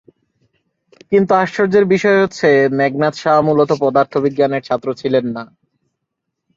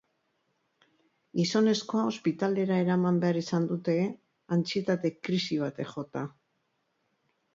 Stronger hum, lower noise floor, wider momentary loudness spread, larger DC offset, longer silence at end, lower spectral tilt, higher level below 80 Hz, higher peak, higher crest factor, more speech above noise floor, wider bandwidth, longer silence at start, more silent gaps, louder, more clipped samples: neither; about the same, -76 dBFS vs -76 dBFS; second, 6 LU vs 11 LU; neither; second, 1.1 s vs 1.25 s; about the same, -6.5 dB/octave vs -6.5 dB/octave; first, -58 dBFS vs -74 dBFS; first, -2 dBFS vs -14 dBFS; about the same, 14 dB vs 16 dB; first, 62 dB vs 48 dB; about the same, 7.6 kHz vs 7.6 kHz; second, 1.1 s vs 1.35 s; neither; first, -15 LUFS vs -29 LUFS; neither